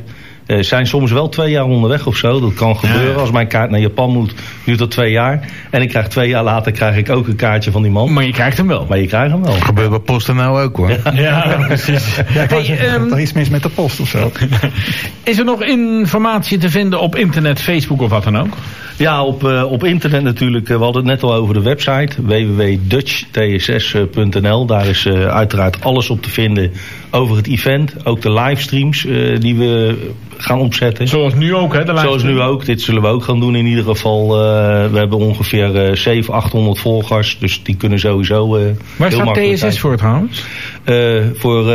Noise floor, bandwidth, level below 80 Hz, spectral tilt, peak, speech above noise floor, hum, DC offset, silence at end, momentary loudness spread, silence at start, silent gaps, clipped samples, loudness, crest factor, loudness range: -32 dBFS; 15.5 kHz; -38 dBFS; -6.5 dB/octave; -2 dBFS; 20 dB; none; 1%; 0 s; 4 LU; 0 s; none; under 0.1%; -13 LUFS; 10 dB; 1 LU